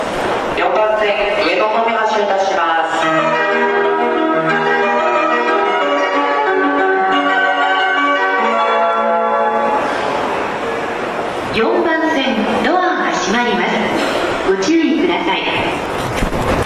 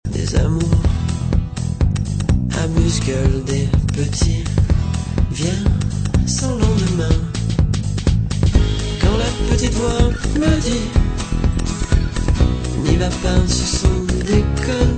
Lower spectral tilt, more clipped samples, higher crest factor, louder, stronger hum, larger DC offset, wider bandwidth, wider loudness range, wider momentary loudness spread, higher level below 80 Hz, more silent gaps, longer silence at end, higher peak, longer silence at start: about the same, -4.5 dB/octave vs -5.5 dB/octave; neither; about the same, 12 dB vs 16 dB; first, -15 LUFS vs -18 LUFS; neither; neither; first, 14 kHz vs 9.2 kHz; about the same, 3 LU vs 1 LU; about the same, 4 LU vs 3 LU; second, -38 dBFS vs -20 dBFS; neither; about the same, 0 s vs 0 s; second, -4 dBFS vs 0 dBFS; about the same, 0 s vs 0.05 s